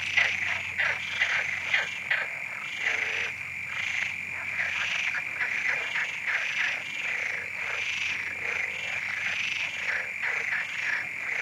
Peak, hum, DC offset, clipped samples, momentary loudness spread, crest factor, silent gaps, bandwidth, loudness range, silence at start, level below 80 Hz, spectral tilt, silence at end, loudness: -10 dBFS; none; under 0.1%; under 0.1%; 5 LU; 20 dB; none; 16 kHz; 1 LU; 0 s; -72 dBFS; -0.5 dB/octave; 0 s; -28 LUFS